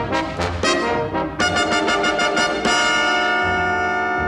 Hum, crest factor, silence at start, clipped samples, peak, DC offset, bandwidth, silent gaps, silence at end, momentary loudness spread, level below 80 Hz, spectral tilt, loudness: none; 16 dB; 0 s; under 0.1%; -4 dBFS; under 0.1%; 12.5 kHz; none; 0 s; 5 LU; -40 dBFS; -3 dB/octave; -18 LUFS